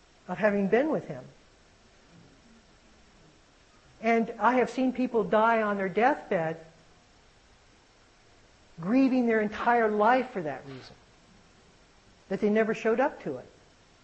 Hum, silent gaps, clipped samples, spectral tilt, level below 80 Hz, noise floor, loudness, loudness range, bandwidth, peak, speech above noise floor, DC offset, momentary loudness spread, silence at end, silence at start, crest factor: none; none; under 0.1%; -7 dB/octave; -64 dBFS; -60 dBFS; -27 LUFS; 6 LU; 8.4 kHz; -10 dBFS; 33 dB; under 0.1%; 15 LU; 0.6 s; 0.3 s; 20 dB